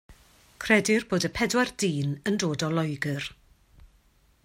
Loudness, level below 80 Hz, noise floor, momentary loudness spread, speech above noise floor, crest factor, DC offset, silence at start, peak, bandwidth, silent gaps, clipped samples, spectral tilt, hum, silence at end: -26 LUFS; -56 dBFS; -62 dBFS; 9 LU; 36 dB; 22 dB; under 0.1%; 0.1 s; -8 dBFS; 16 kHz; none; under 0.1%; -4.5 dB/octave; none; 1.1 s